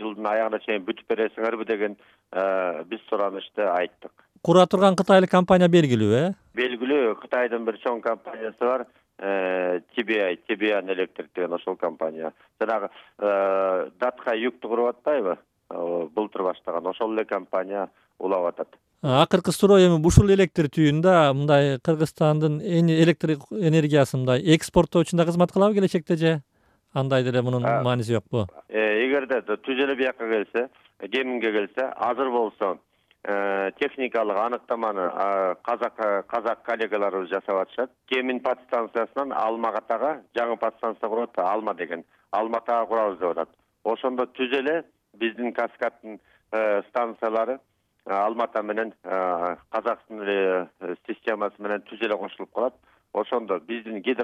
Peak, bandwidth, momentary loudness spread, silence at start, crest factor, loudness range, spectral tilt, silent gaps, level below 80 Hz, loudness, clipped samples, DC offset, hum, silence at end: -2 dBFS; 14 kHz; 12 LU; 0 s; 22 dB; 8 LU; -6.5 dB/octave; none; -48 dBFS; -24 LUFS; under 0.1%; under 0.1%; none; 0 s